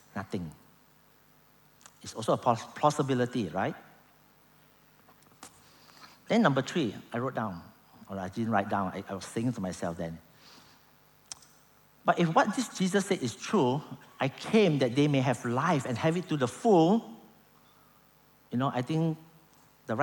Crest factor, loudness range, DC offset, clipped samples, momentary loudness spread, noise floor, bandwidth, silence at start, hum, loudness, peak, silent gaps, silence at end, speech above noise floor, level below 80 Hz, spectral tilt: 22 dB; 7 LU; under 0.1%; under 0.1%; 17 LU; -62 dBFS; over 20 kHz; 0.15 s; none; -29 LUFS; -8 dBFS; none; 0 s; 33 dB; -70 dBFS; -6 dB/octave